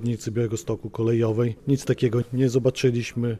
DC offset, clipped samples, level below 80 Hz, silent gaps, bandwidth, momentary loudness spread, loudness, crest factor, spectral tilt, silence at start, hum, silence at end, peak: under 0.1%; under 0.1%; -52 dBFS; none; 14 kHz; 5 LU; -24 LUFS; 14 dB; -7 dB/octave; 0 s; none; 0 s; -10 dBFS